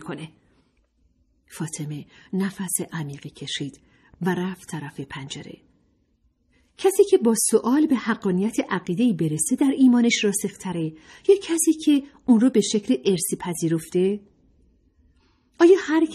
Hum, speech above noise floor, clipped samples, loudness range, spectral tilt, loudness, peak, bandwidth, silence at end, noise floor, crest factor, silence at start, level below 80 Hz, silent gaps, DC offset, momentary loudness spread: none; 44 dB; under 0.1%; 11 LU; -4.5 dB/octave; -22 LUFS; -4 dBFS; 14.5 kHz; 0 s; -66 dBFS; 18 dB; 0 s; -62 dBFS; none; under 0.1%; 17 LU